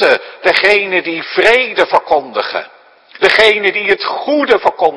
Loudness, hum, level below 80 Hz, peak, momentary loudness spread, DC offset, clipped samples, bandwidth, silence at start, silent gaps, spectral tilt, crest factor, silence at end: -12 LUFS; none; -50 dBFS; 0 dBFS; 8 LU; under 0.1%; 0.6%; 11 kHz; 0 s; none; -3 dB/octave; 12 dB; 0 s